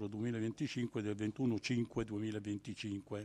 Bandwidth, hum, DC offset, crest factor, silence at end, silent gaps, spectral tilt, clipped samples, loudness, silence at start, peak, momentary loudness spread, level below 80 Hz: 11 kHz; none; under 0.1%; 14 dB; 0 s; none; -6.5 dB/octave; under 0.1%; -40 LUFS; 0 s; -24 dBFS; 6 LU; -66 dBFS